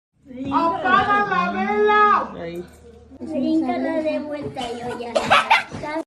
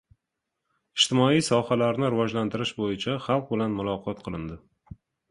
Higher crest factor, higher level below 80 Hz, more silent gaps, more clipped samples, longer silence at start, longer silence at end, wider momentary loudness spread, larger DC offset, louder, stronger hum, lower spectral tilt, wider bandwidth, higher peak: about the same, 18 dB vs 20 dB; about the same, -54 dBFS vs -56 dBFS; neither; neither; second, 0.25 s vs 0.95 s; second, 0.05 s vs 0.35 s; about the same, 14 LU vs 14 LU; neither; first, -20 LUFS vs -26 LUFS; neither; about the same, -4.5 dB/octave vs -5 dB/octave; about the same, 12.5 kHz vs 11.5 kHz; first, -2 dBFS vs -8 dBFS